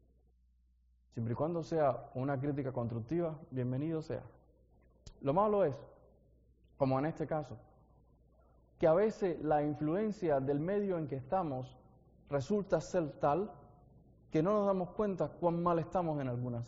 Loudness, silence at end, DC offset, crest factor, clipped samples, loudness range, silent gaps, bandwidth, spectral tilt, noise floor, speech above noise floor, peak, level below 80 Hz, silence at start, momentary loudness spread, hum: -35 LUFS; 0 s; under 0.1%; 18 dB; under 0.1%; 4 LU; none; 7.4 kHz; -8 dB/octave; -70 dBFS; 36 dB; -18 dBFS; -62 dBFS; 1.15 s; 9 LU; none